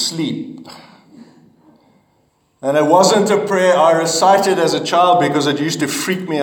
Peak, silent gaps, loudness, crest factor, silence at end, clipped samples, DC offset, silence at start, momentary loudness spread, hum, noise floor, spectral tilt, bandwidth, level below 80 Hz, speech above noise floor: 0 dBFS; none; -14 LUFS; 16 dB; 0 s; under 0.1%; under 0.1%; 0 s; 11 LU; none; -60 dBFS; -4 dB/octave; 19 kHz; -66 dBFS; 45 dB